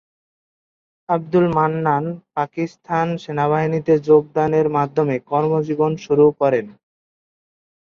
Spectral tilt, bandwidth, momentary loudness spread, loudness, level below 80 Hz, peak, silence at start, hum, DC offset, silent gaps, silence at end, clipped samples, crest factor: -8.5 dB/octave; 6.8 kHz; 9 LU; -19 LUFS; -58 dBFS; -2 dBFS; 1.1 s; none; under 0.1%; none; 1.25 s; under 0.1%; 16 dB